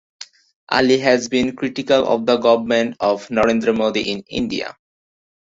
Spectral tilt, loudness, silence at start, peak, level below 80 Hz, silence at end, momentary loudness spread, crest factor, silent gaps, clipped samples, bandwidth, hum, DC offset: -4.5 dB/octave; -18 LUFS; 0.2 s; -2 dBFS; -52 dBFS; 0.7 s; 10 LU; 18 dB; 0.56-0.67 s; under 0.1%; 7.8 kHz; none; under 0.1%